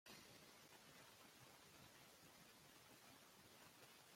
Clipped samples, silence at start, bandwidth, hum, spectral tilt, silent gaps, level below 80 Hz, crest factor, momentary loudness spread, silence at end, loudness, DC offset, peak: under 0.1%; 0.05 s; 16.5 kHz; none; -2.5 dB/octave; none; under -90 dBFS; 18 dB; 2 LU; 0 s; -65 LUFS; under 0.1%; -50 dBFS